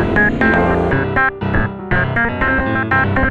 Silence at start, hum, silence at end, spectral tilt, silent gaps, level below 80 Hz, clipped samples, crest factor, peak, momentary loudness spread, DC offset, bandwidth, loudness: 0 s; none; 0 s; -8.5 dB/octave; none; -26 dBFS; under 0.1%; 14 dB; 0 dBFS; 5 LU; under 0.1%; 7.4 kHz; -15 LUFS